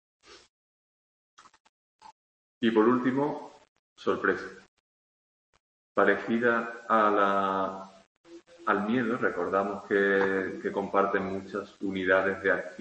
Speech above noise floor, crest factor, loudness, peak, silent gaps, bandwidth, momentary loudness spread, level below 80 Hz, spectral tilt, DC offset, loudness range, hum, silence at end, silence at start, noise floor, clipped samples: over 63 dB; 22 dB; -27 LUFS; -8 dBFS; 0.49-1.37 s, 1.60-1.99 s, 2.12-2.61 s, 3.68-3.96 s, 4.68-5.53 s, 5.60-5.95 s, 8.06-8.24 s; 8.6 kHz; 11 LU; -72 dBFS; -6.5 dB/octave; under 0.1%; 3 LU; none; 0.05 s; 0.3 s; under -90 dBFS; under 0.1%